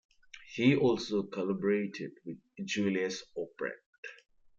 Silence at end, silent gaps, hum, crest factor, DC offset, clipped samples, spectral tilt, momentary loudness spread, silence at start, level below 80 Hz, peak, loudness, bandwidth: 0.45 s; 3.86-4.03 s; none; 20 dB; under 0.1%; under 0.1%; -5.5 dB/octave; 19 LU; 0.35 s; -74 dBFS; -12 dBFS; -32 LUFS; 7.8 kHz